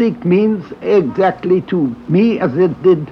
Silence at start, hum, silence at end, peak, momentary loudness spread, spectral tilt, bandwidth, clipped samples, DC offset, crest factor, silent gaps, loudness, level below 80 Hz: 0 s; none; 0 s; -2 dBFS; 5 LU; -9.5 dB/octave; 6 kHz; under 0.1%; under 0.1%; 12 dB; none; -15 LUFS; -52 dBFS